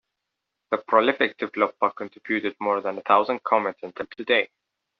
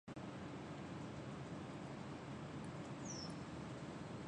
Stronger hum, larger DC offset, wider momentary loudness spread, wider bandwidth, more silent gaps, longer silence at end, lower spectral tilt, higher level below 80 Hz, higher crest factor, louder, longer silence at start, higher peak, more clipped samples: neither; neither; first, 13 LU vs 2 LU; second, 6 kHz vs 10 kHz; neither; first, 0.55 s vs 0 s; second, -1 dB/octave vs -5.5 dB/octave; about the same, -72 dBFS vs -68 dBFS; first, 22 dB vs 12 dB; first, -24 LUFS vs -50 LUFS; first, 0.7 s vs 0.05 s; first, -4 dBFS vs -36 dBFS; neither